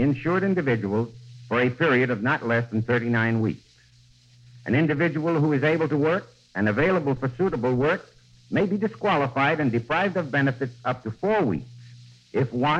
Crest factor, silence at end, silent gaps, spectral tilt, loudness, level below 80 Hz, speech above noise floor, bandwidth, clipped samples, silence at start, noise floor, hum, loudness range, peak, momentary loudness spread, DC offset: 16 dB; 0 s; none; -8 dB/octave; -24 LUFS; -54 dBFS; 32 dB; 8.2 kHz; under 0.1%; 0 s; -56 dBFS; none; 2 LU; -8 dBFS; 7 LU; under 0.1%